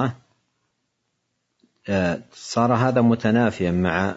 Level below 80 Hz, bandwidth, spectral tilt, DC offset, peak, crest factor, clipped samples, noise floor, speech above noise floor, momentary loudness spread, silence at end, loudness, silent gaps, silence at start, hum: -58 dBFS; 8 kHz; -7 dB/octave; under 0.1%; -4 dBFS; 18 dB; under 0.1%; -75 dBFS; 54 dB; 9 LU; 0 s; -21 LUFS; none; 0 s; none